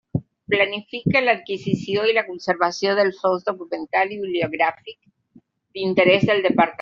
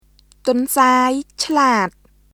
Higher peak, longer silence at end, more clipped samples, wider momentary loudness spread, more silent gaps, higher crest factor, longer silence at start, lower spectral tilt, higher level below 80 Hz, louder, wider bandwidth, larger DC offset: about the same, -2 dBFS vs 0 dBFS; second, 0 s vs 0.45 s; neither; about the same, 11 LU vs 9 LU; neither; about the same, 18 dB vs 16 dB; second, 0.15 s vs 0.45 s; about the same, -3.5 dB/octave vs -3 dB/octave; about the same, -58 dBFS vs -54 dBFS; second, -21 LUFS vs -17 LUFS; second, 7.6 kHz vs 18 kHz; neither